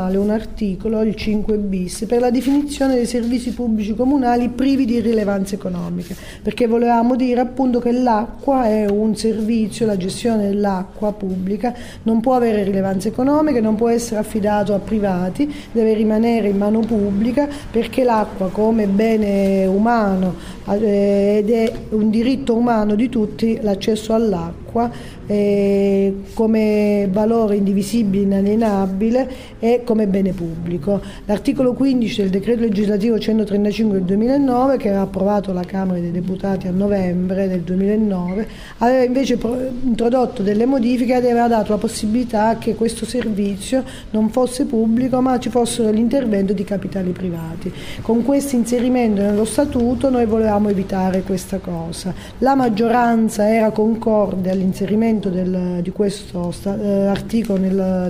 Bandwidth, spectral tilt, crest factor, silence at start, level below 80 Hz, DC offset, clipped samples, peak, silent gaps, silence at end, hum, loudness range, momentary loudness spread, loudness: 16 kHz; -7 dB/octave; 14 dB; 0 s; -38 dBFS; 0.1%; under 0.1%; -2 dBFS; none; 0 s; none; 2 LU; 7 LU; -18 LUFS